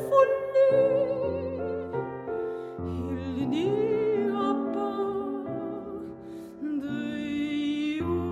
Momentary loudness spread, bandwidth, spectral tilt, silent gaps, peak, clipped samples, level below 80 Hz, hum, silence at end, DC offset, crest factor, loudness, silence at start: 13 LU; 12 kHz; -7.5 dB/octave; none; -8 dBFS; under 0.1%; -56 dBFS; none; 0 s; under 0.1%; 20 dB; -28 LUFS; 0 s